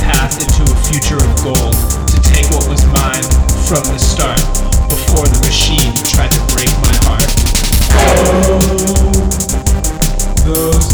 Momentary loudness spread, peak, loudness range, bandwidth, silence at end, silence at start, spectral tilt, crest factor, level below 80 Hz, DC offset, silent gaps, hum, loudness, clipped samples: 4 LU; -2 dBFS; 1 LU; over 20 kHz; 0 s; 0 s; -4 dB/octave; 8 dB; -12 dBFS; under 0.1%; none; none; -12 LUFS; under 0.1%